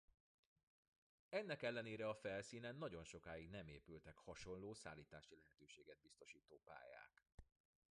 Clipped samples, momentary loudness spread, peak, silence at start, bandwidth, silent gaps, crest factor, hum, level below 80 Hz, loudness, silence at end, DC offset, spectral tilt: under 0.1%; 18 LU; -32 dBFS; 1.3 s; 10.5 kHz; 7.34-7.38 s; 22 dB; none; -76 dBFS; -53 LUFS; 0.5 s; under 0.1%; -5 dB/octave